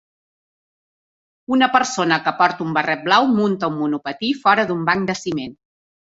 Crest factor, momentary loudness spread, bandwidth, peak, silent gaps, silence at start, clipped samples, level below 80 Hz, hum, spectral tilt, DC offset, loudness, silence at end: 18 dB; 8 LU; 8 kHz; -2 dBFS; none; 1.5 s; under 0.1%; -62 dBFS; none; -4.5 dB/octave; under 0.1%; -18 LUFS; 0.6 s